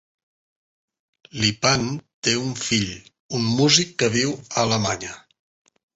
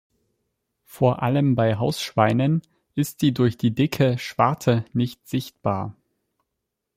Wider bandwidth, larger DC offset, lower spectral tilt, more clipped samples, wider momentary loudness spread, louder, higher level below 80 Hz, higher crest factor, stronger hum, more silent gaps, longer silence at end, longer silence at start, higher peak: second, 8.2 kHz vs 16 kHz; neither; second, -3.5 dB/octave vs -7 dB/octave; neither; first, 13 LU vs 8 LU; about the same, -21 LUFS vs -22 LUFS; first, -52 dBFS vs -58 dBFS; about the same, 22 dB vs 20 dB; neither; first, 2.14-2.22 s, 3.19-3.29 s vs none; second, 0.75 s vs 1.05 s; first, 1.35 s vs 0.95 s; about the same, -2 dBFS vs -2 dBFS